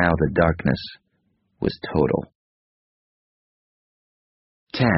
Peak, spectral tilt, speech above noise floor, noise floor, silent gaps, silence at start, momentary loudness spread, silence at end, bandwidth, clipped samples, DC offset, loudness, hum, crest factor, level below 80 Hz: -2 dBFS; -5.5 dB/octave; 48 dB; -69 dBFS; 2.35-4.67 s; 0 s; 14 LU; 0 s; 5.8 kHz; under 0.1%; under 0.1%; -23 LUFS; none; 22 dB; -42 dBFS